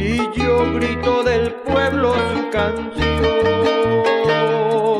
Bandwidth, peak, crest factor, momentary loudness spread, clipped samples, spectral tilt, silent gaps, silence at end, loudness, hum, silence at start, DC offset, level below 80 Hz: 11 kHz; -4 dBFS; 12 dB; 4 LU; under 0.1%; -6 dB/octave; none; 0 s; -17 LUFS; none; 0 s; under 0.1%; -34 dBFS